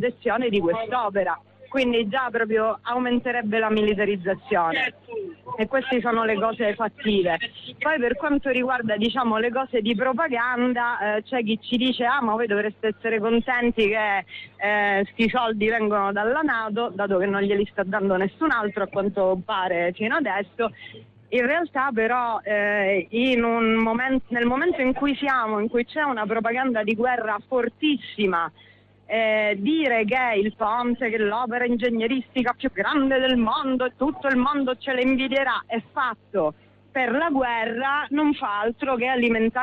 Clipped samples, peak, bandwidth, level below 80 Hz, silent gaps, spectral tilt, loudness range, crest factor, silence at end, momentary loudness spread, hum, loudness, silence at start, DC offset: under 0.1%; -10 dBFS; 6.4 kHz; -54 dBFS; none; -7 dB/octave; 2 LU; 12 dB; 0 s; 5 LU; none; -23 LUFS; 0 s; under 0.1%